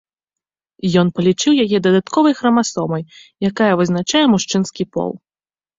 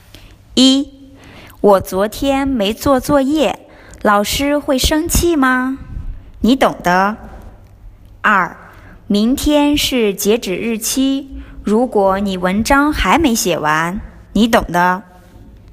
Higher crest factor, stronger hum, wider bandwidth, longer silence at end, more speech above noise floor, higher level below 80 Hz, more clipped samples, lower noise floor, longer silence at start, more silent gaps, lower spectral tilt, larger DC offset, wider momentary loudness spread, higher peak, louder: about the same, 16 dB vs 16 dB; neither; second, 7.8 kHz vs 16 kHz; about the same, 0.6 s vs 0.7 s; first, over 74 dB vs 27 dB; second, -56 dBFS vs -32 dBFS; neither; first, under -90 dBFS vs -40 dBFS; first, 0.85 s vs 0.2 s; neither; about the same, -5 dB/octave vs -4 dB/octave; neither; about the same, 10 LU vs 10 LU; about the same, -2 dBFS vs 0 dBFS; about the same, -16 LUFS vs -14 LUFS